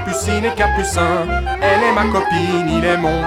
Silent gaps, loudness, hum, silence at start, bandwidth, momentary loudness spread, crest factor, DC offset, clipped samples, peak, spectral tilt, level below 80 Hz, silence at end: none; -16 LUFS; none; 0 s; 16.5 kHz; 4 LU; 14 dB; under 0.1%; under 0.1%; -2 dBFS; -5 dB/octave; -28 dBFS; 0 s